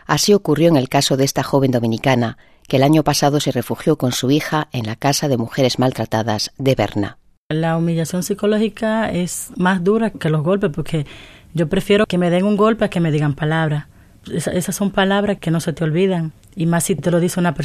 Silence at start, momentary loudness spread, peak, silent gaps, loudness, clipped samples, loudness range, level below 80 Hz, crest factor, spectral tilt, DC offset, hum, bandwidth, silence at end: 0.1 s; 8 LU; 0 dBFS; 7.37-7.50 s; -18 LUFS; under 0.1%; 3 LU; -44 dBFS; 18 dB; -5.5 dB/octave; under 0.1%; none; 14 kHz; 0 s